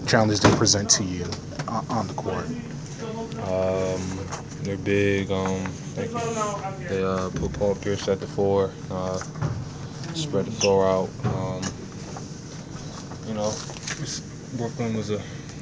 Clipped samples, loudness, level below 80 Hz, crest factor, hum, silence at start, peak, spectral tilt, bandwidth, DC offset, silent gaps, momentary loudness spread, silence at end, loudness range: under 0.1%; -26 LUFS; -46 dBFS; 26 dB; none; 0 s; 0 dBFS; -4.5 dB/octave; 8 kHz; under 0.1%; none; 15 LU; 0 s; 6 LU